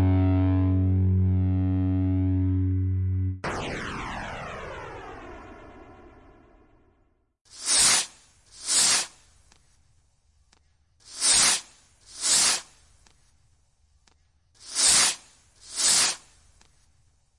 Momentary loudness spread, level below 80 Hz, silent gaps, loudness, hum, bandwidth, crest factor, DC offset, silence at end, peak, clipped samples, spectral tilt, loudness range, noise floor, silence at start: 19 LU; -54 dBFS; 7.41-7.45 s; -22 LUFS; none; 11.5 kHz; 20 dB; under 0.1%; 1.2 s; -6 dBFS; under 0.1%; -2.5 dB/octave; 12 LU; -67 dBFS; 0 s